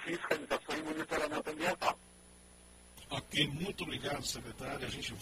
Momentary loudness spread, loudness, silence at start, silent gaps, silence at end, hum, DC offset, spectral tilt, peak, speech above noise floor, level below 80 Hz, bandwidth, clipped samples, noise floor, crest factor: 12 LU; -37 LUFS; 0 s; none; 0 s; none; under 0.1%; -3.5 dB/octave; -16 dBFS; 21 dB; -60 dBFS; 16 kHz; under 0.1%; -59 dBFS; 22 dB